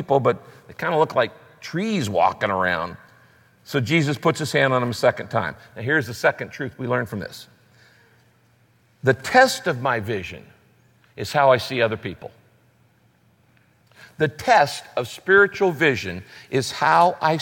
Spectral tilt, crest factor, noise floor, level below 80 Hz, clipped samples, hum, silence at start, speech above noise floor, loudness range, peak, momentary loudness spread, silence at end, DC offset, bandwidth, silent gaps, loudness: -5 dB/octave; 20 dB; -59 dBFS; -60 dBFS; under 0.1%; none; 0 s; 38 dB; 5 LU; -2 dBFS; 15 LU; 0 s; under 0.1%; 17 kHz; none; -21 LUFS